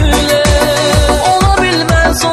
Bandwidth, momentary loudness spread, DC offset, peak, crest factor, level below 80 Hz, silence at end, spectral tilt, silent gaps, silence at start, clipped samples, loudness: 14 kHz; 1 LU; under 0.1%; 0 dBFS; 10 dB; -16 dBFS; 0 s; -4 dB/octave; none; 0 s; under 0.1%; -10 LUFS